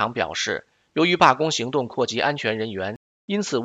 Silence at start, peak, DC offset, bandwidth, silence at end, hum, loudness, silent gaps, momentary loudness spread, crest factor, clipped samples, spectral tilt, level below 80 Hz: 0 s; 0 dBFS; under 0.1%; 9.4 kHz; 0 s; none; -22 LUFS; 2.96-3.28 s; 14 LU; 22 dB; under 0.1%; -4 dB/octave; -62 dBFS